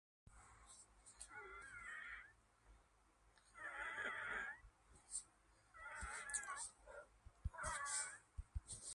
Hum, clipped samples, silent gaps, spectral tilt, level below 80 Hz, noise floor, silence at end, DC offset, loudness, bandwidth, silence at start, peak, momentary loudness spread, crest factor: none; under 0.1%; none; -1.5 dB/octave; -62 dBFS; -75 dBFS; 0 s; under 0.1%; -49 LUFS; 11.5 kHz; 0.25 s; -30 dBFS; 21 LU; 22 dB